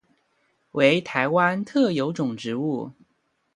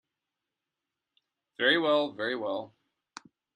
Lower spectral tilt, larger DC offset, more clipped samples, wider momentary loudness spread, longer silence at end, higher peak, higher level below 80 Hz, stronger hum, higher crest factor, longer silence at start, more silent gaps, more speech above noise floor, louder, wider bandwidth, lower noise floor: first, -6 dB/octave vs -4.5 dB/octave; neither; neither; about the same, 11 LU vs 13 LU; second, 0.65 s vs 0.9 s; first, -4 dBFS vs -10 dBFS; first, -70 dBFS vs -80 dBFS; neither; about the same, 20 dB vs 22 dB; second, 0.75 s vs 1.6 s; neither; second, 48 dB vs 60 dB; first, -23 LUFS vs -28 LUFS; about the same, 11 kHz vs 10 kHz; second, -71 dBFS vs -88 dBFS